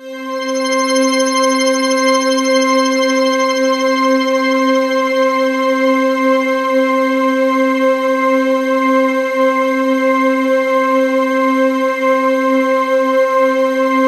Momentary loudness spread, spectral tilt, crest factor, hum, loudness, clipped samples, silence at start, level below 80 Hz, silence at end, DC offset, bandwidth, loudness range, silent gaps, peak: 2 LU; -2 dB/octave; 12 dB; none; -13 LUFS; under 0.1%; 0 s; -66 dBFS; 0 s; under 0.1%; 13.5 kHz; 1 LU; none; -2 dBFS